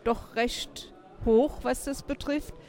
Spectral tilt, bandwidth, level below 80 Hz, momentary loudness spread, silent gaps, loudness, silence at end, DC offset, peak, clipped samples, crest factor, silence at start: -4.5 dB/octave; 17 kHz; -44 dBFS; 14 LU; none; -29 LUFS; 0.05 s; under 0.1%; -12 dBFS; under 0.1%; 16 dB; 0.05 s